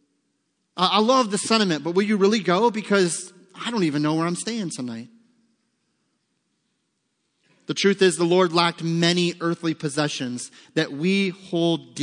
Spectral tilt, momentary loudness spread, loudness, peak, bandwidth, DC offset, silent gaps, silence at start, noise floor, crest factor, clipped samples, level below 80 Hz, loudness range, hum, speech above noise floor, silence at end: -4.5 dB/octave; 12 LU; -22 LUFS; -4 dBFS; 10.5 kHz; under 0.1%; none; 0.75 s; -74 dBFS; 20 dB; under 0.1%; -76 dBFS; 9 LU; none; 52 dB; 0 s